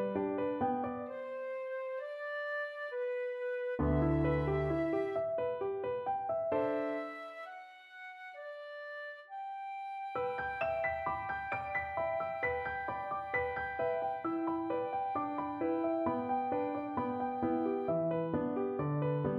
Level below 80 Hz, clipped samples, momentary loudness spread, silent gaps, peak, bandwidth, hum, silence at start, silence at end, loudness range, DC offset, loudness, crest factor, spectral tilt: -54 dBFS; under 0.1%; 11 LU; none; -20 dBFS; 5.6 kHz; none; 0 s; 0 s; 5 LU; under 0.1%; -36 LUFS; 16 dB; -9 dB/octave